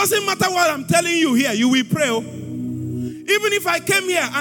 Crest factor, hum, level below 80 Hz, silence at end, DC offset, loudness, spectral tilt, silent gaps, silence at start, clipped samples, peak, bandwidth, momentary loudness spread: 14 dB; none; -62 dBFS; 0 s; under 0.1%; -18 LUFS; -3.5 dB/octave; none; 0 s; under 0.1%; -4 dBFS; 18 kHz; 11 LU